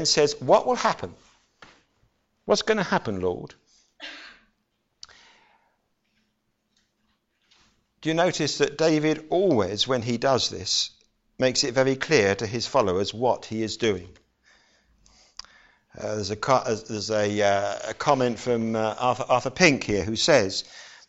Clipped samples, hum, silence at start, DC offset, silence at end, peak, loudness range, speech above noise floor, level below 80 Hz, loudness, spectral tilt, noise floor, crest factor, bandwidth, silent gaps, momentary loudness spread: under 0.1%; none; 0 s; under 0.1%; 0.15 s; -4 dBFS; 8 LU; 50 dB; -58 dBFS; -24 LUFS; -4 dB/octave; -74 dBFS; 22 dB; 8.2 kHz; none; 15 LU